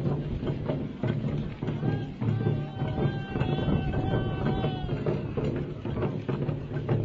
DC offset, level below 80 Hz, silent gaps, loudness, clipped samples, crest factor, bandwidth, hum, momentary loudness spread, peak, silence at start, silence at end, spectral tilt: under 0.1%; -42 dBFS; none; -30 LUFS; under 0.1%; 16 dB; 5.2 kHz; none; 4 LU; -14 dBFS; 0 s; 0 s; -9.5 dB/octave